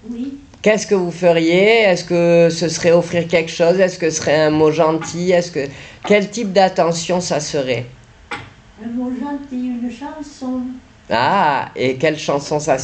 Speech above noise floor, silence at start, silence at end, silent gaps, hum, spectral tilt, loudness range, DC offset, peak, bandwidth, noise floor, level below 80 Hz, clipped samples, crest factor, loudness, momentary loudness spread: 20 dB; 0.05 s; 0 s; none; none; -4.5 dB/octave; 10 LU; under 0.1%; -2 dBFS; 9 kHz; -36 dBFS; -50 dBFS; under 0.1%; 14 dB; -16 LUFS; 15 LU